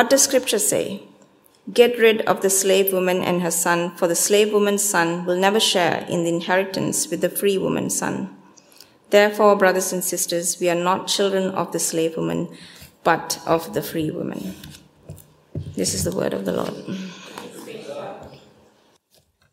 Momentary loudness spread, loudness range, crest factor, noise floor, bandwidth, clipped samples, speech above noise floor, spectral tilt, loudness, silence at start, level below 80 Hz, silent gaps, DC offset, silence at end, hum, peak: 17 LU; 9 LU; 20 dB; -61 dBFS; 16 kHz; under 0.1%; 41 dB; -3 dB/octave; -20 LUFS; 0 s; -58 dBFS; none; under 0.1%; 1.15 s; none; 0 dBFS